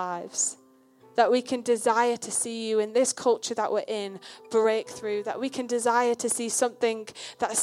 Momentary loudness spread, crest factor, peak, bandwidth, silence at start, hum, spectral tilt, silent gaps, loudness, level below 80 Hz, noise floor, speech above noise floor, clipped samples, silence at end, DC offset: 8 LU; 20 dB; -8 dBFS; 14 kHz; 0 s; none; -2 dB/octave; none; -26 LUFS; -78 dBFS; -57 dBFS; 30 dB; under 0.1%; 0 s; under 0.1%